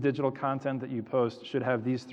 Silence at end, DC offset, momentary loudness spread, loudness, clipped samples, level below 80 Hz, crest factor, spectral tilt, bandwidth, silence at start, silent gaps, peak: 0 s; under 0.1%; 4 LU; -31 LUFS; under 0.1%; -78 dBFS; 16 dB; -8 dB/octave; 8.4 kHz; 0 s; none; -14 dBFS